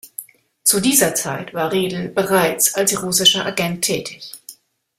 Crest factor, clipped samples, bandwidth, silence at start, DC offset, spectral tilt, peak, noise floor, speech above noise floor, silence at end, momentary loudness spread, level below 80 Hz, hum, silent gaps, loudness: 20 dB; under 0.1%; 16 kHz; 0.05 s; under 0.1%; -2 dB/octave; 0 dBFS; -44 dBFS; 25 dB; 0.45 s; 20 LU; -56 dBFS; none; none; -17 LUFS